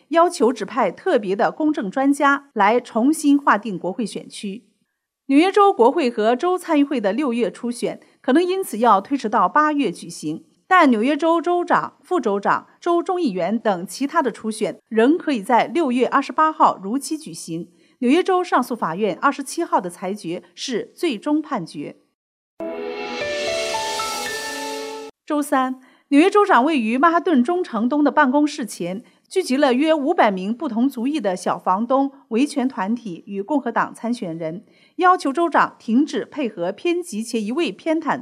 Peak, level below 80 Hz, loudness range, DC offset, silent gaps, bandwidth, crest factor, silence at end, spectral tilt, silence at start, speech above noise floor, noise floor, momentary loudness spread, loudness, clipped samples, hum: -2 dBFS; -70 dBFS; 6 LU; under 0.1%; 22.15-22.57 s; 15 kHz; 16 dB; 0 s; -4.5 dB/octave; 0.1 s; 54 dB; -73 dBFS; 12 LU; -20 LUFS; under 0.1%; none